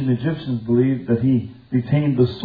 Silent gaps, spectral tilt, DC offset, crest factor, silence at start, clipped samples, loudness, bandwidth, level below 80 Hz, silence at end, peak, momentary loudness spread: none; -11 dB/octave; under 0.1%; 16 dB; 0 s; under 0.1%; -20 LUFS; 5 kHz; -50 dBFS; 0 s; -4 dBFS; 6 LU